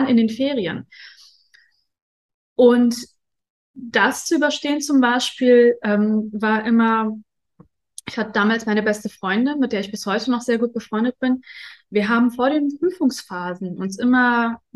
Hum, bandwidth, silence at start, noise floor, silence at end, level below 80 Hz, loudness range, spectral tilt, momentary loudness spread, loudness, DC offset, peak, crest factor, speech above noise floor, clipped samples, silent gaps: none; 12.5 kHz; 0 s; -58 dBFS; 0.2 s; -64 dBFS; 4 LU; -4.5 dB/octave; 13 LU; -19 LUFS; under 0.1%; -2 dBFS; 18 dB; 39 dB; under 0.1%; 2.02-2.56 s, 3.50-3.74 s